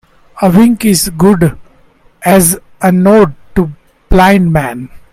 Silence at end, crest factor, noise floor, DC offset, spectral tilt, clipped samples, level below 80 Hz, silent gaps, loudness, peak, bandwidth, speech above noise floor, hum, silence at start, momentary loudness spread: 0.15 s; 10 dB; -45 dBFS; under 0.1%; -5.5 dB/octave; 0.3%; -26 dBFS; none; -9 LUFS; 0 dBFS; 16.5 kHz; 37 dB; none; 0.35 s; 9 LU